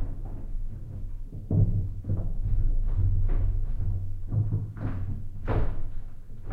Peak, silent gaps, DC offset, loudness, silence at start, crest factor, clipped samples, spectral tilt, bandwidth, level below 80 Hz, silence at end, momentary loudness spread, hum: -12 dBFS; none; under 0.1%; -31 LUFS; 0 s; 14 dB; under 0.1%; -10.5 dB/octave; 2.8 kHz; -28 dBFS; 0 s; 13 LU; none